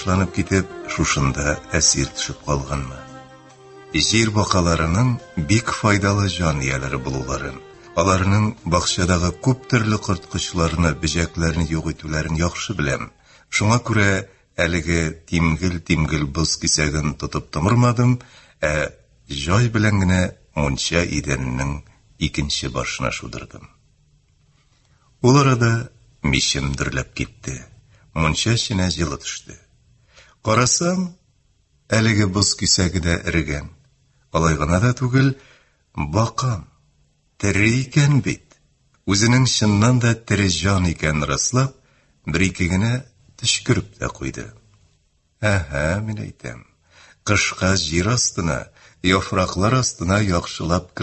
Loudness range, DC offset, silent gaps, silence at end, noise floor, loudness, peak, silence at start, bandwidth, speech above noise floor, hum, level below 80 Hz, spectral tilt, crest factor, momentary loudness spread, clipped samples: 5 LU; under 0.1%; none; 0 s; -62 dBFS; -20 LUFS; -2 dBFS; 0 s; 8.6 kHz; 43 dB; none; -34 dBFS; -4.5 dB/octave; 20 dB; 12 LU; under 0.1%